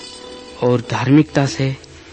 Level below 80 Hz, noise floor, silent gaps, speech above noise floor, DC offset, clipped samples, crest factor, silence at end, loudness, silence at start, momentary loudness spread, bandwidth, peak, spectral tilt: -48 dBFS; -35 dBFS; none; 19 dB; under 0.1%; under 0.1%; 16 dB; 0 s; -17 LUFS; 0 s; 20 LU; 8.8 kHz; -2 dBFS; -6.5 dB/octave